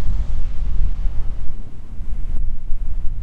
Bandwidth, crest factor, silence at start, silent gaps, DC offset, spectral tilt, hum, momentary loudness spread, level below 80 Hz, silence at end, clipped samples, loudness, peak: 1.3 kHz; 10 dB; 0 s; none; under 0.1%; -8 dB/octave; none; 10 LU; -20 dBFS; 0 s; under 0.1%; -29 LUFS; -4 dBFS